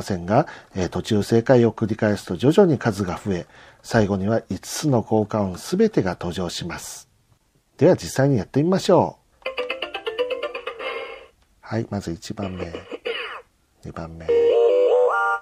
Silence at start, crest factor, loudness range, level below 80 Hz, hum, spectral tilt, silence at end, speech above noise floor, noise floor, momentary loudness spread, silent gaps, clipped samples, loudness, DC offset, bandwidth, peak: 0 s; 20 dB; 9 LU; -52 dBFS; none; -6 dB/octave; 0 s; 40 dB; -61 dBFS; 16 LU; none; under 0.1%; -22 LUFS; under 0.1%; 15.5 kHz; -2 dBFS